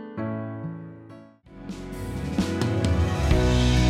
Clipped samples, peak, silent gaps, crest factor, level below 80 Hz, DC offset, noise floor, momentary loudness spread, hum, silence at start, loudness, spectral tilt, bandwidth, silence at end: under 0.1%; -8 dBFS; none; 16 dB; -30 dBFS; under 0.1%; -47 dBFS; 21 LU; none; 0 s; -26 LUFS; -6 dB/octave; 14.5 kHz; 0 s